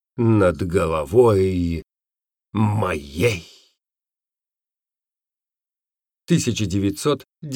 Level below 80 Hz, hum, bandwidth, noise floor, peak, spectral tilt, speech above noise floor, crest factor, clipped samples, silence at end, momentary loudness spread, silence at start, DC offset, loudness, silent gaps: -48 dBFS; none; 17.5 kHz; under -90 dBFS; -4 dBFS; -6.5 dB/octave; over 71 dB; 18 dB; under 0.1%; 0 s; 10 LU; 0.15 s; under 0.1%; -20 LUFS; none